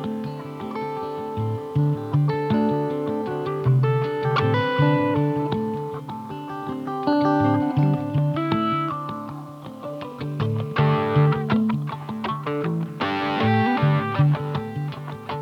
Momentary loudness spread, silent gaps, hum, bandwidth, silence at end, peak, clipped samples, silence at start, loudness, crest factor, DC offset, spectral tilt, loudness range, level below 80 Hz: 12 LU; none; none; 6.2 kHz; 0 s; -6 dBFS; under 0.1%; 0 s; -23 LUFS; 16 dB; under 0.1%; -8.5 dB/octave; 3 LU; -56 dBFS